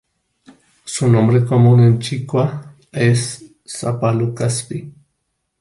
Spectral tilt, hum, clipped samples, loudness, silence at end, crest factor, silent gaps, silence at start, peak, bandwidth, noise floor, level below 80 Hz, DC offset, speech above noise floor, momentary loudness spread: -6.5 dB/octave; none; under 0.1%; -16 LUFS; 0.7 s; 16 dB; none; 0.85 s; -2 dBFS; 11.5 kHz; -72 dBFS; -52 dBFS; under 0.1%; 57 dB; 18 LU